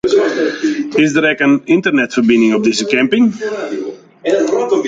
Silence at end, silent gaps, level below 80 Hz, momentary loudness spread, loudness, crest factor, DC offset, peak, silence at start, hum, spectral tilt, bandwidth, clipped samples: 0 s; none; -54 dBFS; 10 LU; -13 LUFS; 12 dB; under 0.1%; 0 dBFS; 0.05 s; none; -4.5 dB/octave; 9.2 kHz; under 0.1%